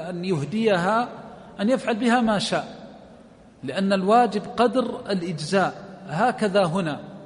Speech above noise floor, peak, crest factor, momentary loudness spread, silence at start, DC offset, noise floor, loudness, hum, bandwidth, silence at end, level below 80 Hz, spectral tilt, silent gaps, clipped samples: 26 dB; -6 dBFS; 18 dB; 13 LU; 0 s; under 0.1%; -49 dBFS; -23 LUFS; none; 10.5 kHz; 0 s; -60 dBFS; -5.5 dB/octave; none; under 0.1%